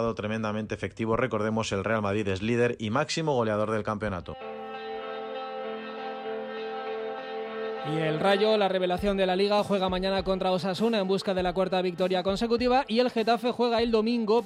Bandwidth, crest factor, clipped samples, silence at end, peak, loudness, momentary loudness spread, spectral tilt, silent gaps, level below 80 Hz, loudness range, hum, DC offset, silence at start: 14 kHz; 16 dB; under 0.1%; 0 s; -10 dBFS; -28 LUFS; 11 LU; -5.5 dB/octave; none; -52 dBFS; 9 LU; none; under 0.1%; 0 s